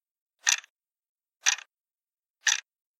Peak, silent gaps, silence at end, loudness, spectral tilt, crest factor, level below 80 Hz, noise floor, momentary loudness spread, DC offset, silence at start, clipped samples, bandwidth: -4 dBFS; 0.70-0.76 s, 0.99-1.03 s, 1.09-1.15 s, 1.36-1.40 s, 2.14-2.18 s, 2.30-2.34 s; 0.45 s; -27 LUFS; 9 dB/octave; 30 dB; under -90 dBFS; under -90 dBFS; 4 LU; under 0.1%; 0.45 s; under 0.1%; 16.5 kHz